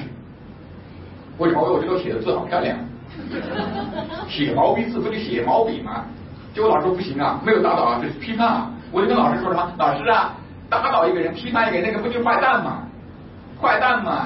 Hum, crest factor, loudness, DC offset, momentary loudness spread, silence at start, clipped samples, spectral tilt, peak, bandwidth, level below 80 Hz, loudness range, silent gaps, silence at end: none; 16 dB; -20 LUFS; under 0.1%; 20 LU; 0 s; under 0.1%; -10.5 dB/octave; -4 dBFS; 5.8 kHz; -50 dBFS; 4 LU; none; 0 s